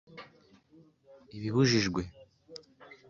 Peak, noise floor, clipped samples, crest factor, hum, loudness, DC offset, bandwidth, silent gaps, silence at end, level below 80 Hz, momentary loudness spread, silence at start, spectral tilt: -14 dBFS; -61 dBFS; under 0.1%; 20 dB; none; -29 LUFS; under 0.1%; 7.4 kHz; none; 0.15 s; -58 dBFS; 24 LU; 0.1 s; -5 dB/octave